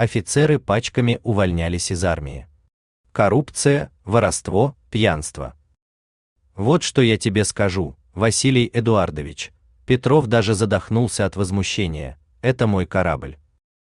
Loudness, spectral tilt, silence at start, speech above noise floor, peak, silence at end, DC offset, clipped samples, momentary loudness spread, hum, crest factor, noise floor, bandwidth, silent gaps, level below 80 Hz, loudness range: -20 LUFS; -5.5 dB/octave; 0 s; over 71 dB; -2 dBFS; 0.55 s; under 0.1%; under 0.1%; 13 LU; none; 18 dB; under -90 dBFS; 12.5 kHz; 2.73-3.04 s, 5.82-6.36 s; -42 dBFS; 2 LU